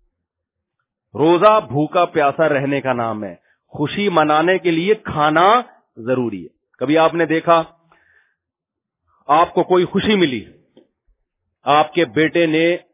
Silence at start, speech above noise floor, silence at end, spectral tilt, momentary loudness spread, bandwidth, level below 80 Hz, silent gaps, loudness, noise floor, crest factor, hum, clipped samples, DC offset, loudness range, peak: 1.15 s; 67 dB; 0.15 s; -9.5 dB/octave; 13 LU; 4 kHz; -54 dBFS; none; -16 LUFS; -83 dBFS; 18 dB; none; under 0.1%; under 0.1%; 3 LU; 0 dBFS